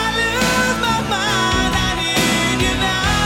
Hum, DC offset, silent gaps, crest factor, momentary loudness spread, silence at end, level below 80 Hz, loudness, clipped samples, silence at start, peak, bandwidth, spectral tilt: none; under 0.1%; none; 12 dB; 2 LU; 0 s; -30 dBFS; -16 LUFS; under 0.1%; 0 s; -4 dBFS; 18 kHz; -3 dB/octave